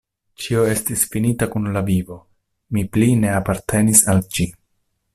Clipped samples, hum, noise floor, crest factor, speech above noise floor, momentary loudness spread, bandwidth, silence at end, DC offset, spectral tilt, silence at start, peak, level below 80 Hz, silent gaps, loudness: under 0.1%; none; -69 dBFS; 20 dB; 51 dB; 12 LU; 16 kHz; 0.65 s; under 0.1%; -5 dB/octave; 0.4 s; 0 dBFS; -44 dBFS; none; -18 LUFS